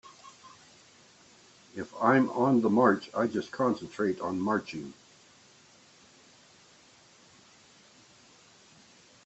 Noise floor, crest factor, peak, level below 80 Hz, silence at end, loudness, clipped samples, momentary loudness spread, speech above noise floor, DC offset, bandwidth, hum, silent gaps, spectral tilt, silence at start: -59 dBFS; 24 dB; -8 dBFS; -74 dBFS; 4.35 s; -28 LUFS; under 0.1%; 22 LU; 31 dB; under 0.1%; 8.2 kHz; none; none; -6.5 dB/octave; 0.05 s